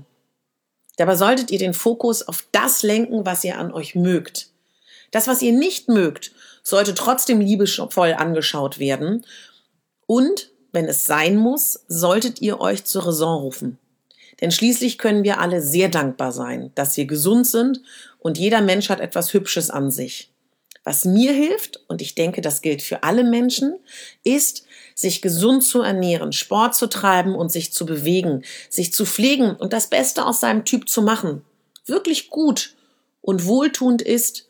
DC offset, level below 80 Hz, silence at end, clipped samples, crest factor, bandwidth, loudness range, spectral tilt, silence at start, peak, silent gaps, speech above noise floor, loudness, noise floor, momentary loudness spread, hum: under 0.1%; -78 dBFS; 0.1 s; under 0.1%; 18 dB; over 20 kHz; 3 LU; -4 dB/octave; 1 s; 0 dBFS; none; 57 dB; -19 LUFS; -76 dBFS; 11 LU; none